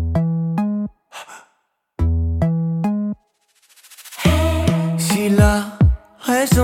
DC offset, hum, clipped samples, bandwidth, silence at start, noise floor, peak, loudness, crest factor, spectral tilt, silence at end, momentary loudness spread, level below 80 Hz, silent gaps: under 0.1%; none; under 0.1%; 17 kHz; 0 s; -67 dBFS; -2 dBFS; -19 LUFS; 16 dB; -6 dB/octave; 0 s; 20 LU; -28 dBFS; none